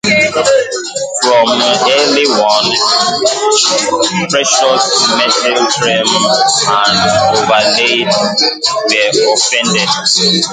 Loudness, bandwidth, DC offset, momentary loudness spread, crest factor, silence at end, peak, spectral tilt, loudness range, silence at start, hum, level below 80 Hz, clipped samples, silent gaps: -10 LUFS; 10 kHz; under 0.1%; 3 LU; 10 dB; 0 s; 0 dBFS; -2 dB/octave; 1 LU; 0.05 s; none; -50 dBFS; under 0.1%; none